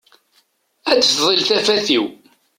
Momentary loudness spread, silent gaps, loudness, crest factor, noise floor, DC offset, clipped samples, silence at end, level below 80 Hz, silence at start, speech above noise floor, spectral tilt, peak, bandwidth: 10 LU; none; -15 LUFS; 16 dB; -61 dBFS; under 0.1%; under 0.1%; 0.45 s; -62 dBFS; 0.85 s; 45 dB; -2 dB/octave; -2 dBFS; 16.5 kHz